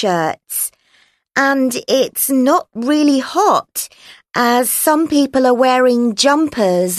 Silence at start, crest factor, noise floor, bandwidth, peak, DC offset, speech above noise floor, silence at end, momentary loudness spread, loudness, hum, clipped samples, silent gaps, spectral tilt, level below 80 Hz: 0 s; 14 dB; -56 dBFS; 13.5 kHz; 0 dBFS; under 0.1%; 41 dB; 0 s; 7 LU; -15 LUFS; none; under 0.1%; none; -3 dB/octave; -58 dBFS